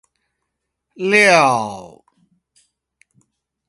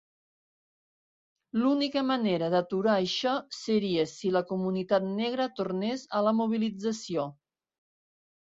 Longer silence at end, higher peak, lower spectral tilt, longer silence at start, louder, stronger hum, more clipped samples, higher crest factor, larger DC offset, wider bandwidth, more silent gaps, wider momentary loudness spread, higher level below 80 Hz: first, 1.8 s vs 1.15 s; first, 0 dBFS vs -12 dBFS; second, -3.5 dB/octave vs -5.5 dB/octave; second, 1 s vs 1.55 s; first, -13 LUFS vs -29 LUFS; neither; neither; about the same, 20 dB vs 18 dB; neither; first, 11.5 kHz vs 7.8 kHz; neither; first, 18 LU vs 6 LU; first, -64 dBFS vs -72 dBFS